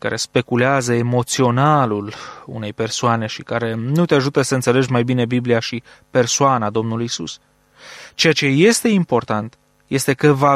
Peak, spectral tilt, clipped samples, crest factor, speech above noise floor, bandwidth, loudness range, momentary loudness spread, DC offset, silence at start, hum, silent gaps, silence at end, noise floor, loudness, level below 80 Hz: -2 dBFS; -5 dB/octave; under 0.1%; 16 dB; 25 dB; 15 kHz; 2 LU; 15 LU; under 0.1%; 0.05 s; none; none; 0 s; -42 dBFS; -17 LUFS; -56 dBFS